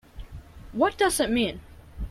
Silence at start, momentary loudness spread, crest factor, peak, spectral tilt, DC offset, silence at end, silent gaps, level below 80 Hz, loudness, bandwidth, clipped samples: 0.15 s; 23 LU; 18 dB; -10 dBFS; -3.5 dB/octave; under 0.1%; 0 s; none; -42 dBFS; -24 LUFS; 16 kHz; under 0.1%